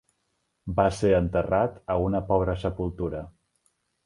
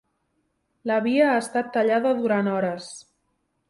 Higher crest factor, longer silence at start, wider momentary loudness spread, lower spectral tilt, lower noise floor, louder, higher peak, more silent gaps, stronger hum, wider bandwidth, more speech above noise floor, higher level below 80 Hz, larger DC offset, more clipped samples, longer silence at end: about the same, 20 dB vs 16 dB; second, 0.65 s vs 0.85 s; second, 10 LU vs 15 LU; first, -7.5 dB/octave vs -5.5 dB/octave; about the same, -75 dBFS vs -73 dBFS; second, -26 LUFS vs -23 LUFS; about the same, -6 dBFS vs -8 dBFS; neither; neither; about the same, 11 kHz vs 11.5 kHz; about the same, 50 dB vs 51 dB; first, -42 dBFS vs -70 dBFS; neither; neither; about the same, 0.75 s vs 0.7 s